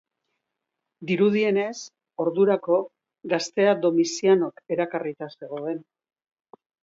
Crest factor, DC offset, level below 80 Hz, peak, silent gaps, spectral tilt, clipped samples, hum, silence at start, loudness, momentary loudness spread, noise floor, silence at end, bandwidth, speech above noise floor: 18 dB; under 0.1%; -74 dBFS; -8 dBFS; none; -5.5 dB/octave; under 0.1%; none; 1 s; -24 LUFS; 17 LU; -83 dBFS; 1 s; 7.8 kHz; 60 dB